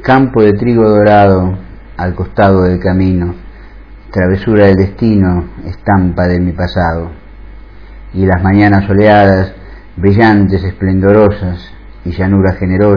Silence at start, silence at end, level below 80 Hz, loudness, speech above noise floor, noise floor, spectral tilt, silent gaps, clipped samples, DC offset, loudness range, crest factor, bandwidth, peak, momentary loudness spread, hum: 0 s; 0 s; -30 dBFS; -10 LUFS; 23 dB; -32 dBFS; -10 dB/octave; none; 0.9%; 0.9%; 4 LU; 10 dB; 5.4 kHz; 0 dBFS; 13 LU; none